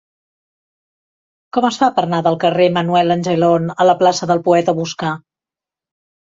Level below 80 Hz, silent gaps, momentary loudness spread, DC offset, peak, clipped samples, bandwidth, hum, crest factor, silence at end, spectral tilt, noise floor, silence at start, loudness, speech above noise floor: -60 dBFS; none; 8 LU; under 0.1%; -2 dBFS; under 0.1%; 7.8 kHz; none; 16 dB; 1.2 s; -5.5 dB/octave; -88 dBFS; 1.55 s; -15 LUFS; 74 dB